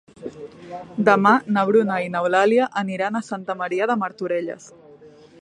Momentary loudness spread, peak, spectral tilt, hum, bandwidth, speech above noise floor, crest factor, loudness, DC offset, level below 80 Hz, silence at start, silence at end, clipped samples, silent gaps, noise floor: 20 LU; -2 dBFS; -6 dB/octave; none; 10.5 kHz; 26 dB; 20 dB; -20 LUFS; under 0.1%; -68 dBFS; 0.2 s; 0.35 s; under 0.1%; none; -47 dBFS